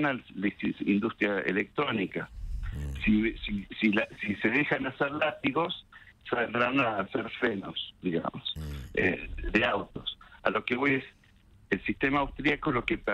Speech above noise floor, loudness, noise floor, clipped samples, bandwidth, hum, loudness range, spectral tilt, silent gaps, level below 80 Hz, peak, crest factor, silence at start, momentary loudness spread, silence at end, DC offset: 29 dB; -30 LUFS; -59 dBFS; under 0.1%; 12 kHz; none; 2 LU; -7 dB/octave; none; -46 dBFS; -10 dBFS; 20 dB; 0 s; 10 LU; 0 s; under 0.1%